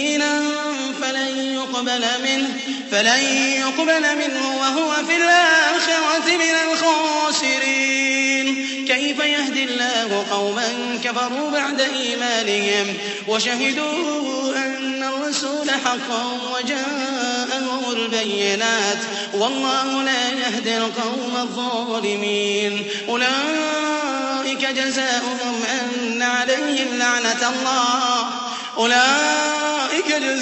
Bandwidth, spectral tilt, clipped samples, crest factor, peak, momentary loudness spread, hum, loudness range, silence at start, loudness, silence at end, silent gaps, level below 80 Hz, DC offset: 8.4 kHz; -1.5 dB/octave; under 0.1%; 18 dB; -2 dBFS; 7 LU; none; 5 LU; 0 s; -19 LUFS; 0 s; none; -72 dBFS; under 0.1%